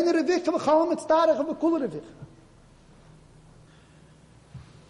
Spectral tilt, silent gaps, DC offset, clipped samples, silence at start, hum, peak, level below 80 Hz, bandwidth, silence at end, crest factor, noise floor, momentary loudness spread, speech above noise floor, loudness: -5.5 dB/octave; none; under 0.1%; under 0.1%; 0 s; none; -10 dBFS; -60 dBFS; 11 kHz; 0.25 s; 16 dB; -54 dBFS; 12 LU; 30 dB; -24 LUFS